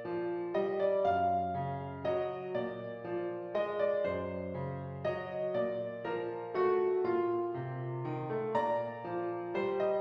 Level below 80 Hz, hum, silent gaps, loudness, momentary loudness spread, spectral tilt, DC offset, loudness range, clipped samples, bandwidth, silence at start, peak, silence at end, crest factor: -72 dBFS; none; none; -35 LUFS; 8 LU; -9 dB/octave; under 0.1%; 2 LU; under 0.1%; 6 kHz; 0 s; -20 dBFS; 0 s; 14 dB